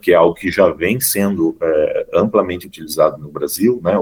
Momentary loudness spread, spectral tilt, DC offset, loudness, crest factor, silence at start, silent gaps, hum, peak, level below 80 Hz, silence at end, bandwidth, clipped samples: 9 LU; -5 dB/octave; under 0.1%; -16 LUFS; 16 dB; 0.05 s; none; none; 0 dBFS; -48 dBFS; 0 s; over 20 kHz; under 0.1%